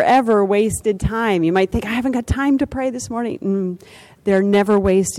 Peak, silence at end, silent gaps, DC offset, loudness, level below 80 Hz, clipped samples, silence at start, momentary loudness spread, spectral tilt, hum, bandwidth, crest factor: -6 dBFS; 0 s; none; under 0.1%; -18 LUFS; -36 dBFS; under 0.1%; 0 s; 9 LU; -5.5 dB/octave; none; 15 kHz; 12 dB